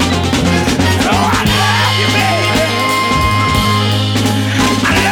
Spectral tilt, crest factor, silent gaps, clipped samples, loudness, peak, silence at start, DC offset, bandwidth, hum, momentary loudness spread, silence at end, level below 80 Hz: -4.5 dB/octave; 12 dB; none; under 0.1%; -12 LUFS; -2 dBFS; 0 s; under 0.1%; 18.5 kHz; none; 2 LU; 0 s; -28 dBFS